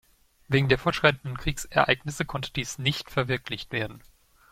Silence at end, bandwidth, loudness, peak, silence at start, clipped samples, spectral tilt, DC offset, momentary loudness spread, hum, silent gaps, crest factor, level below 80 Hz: 0.55 s; 16 kHz; -26 LUFS; -4 dBFS; 0.5 s; under 0.1%; -4.5 dB/octave; under 0.1%; 9 LU; none; none; 24 dB; -46 dBFS